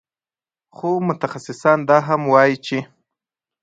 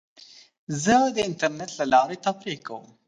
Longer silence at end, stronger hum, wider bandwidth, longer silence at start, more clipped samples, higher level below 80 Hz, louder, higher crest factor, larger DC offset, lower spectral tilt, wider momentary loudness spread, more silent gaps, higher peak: first, 0.8 s vs 0.25 s; neither; second, 9.2 kHz vs 10.5 kHz; first, 0.85 s vs 0.2 s; neither; second, -66 dBFS vs -60 dBFS; first, -18 LUFS vs -24 LUFS; about the same, 20 dB vs 18 dB; neither; first, -6.5 dB/octave vs -4 dB/octave; about the same, 12 LU vs 14 LU; second, none vs 0.58-0.67 s; first, 0 dBFS vs -6 dBFS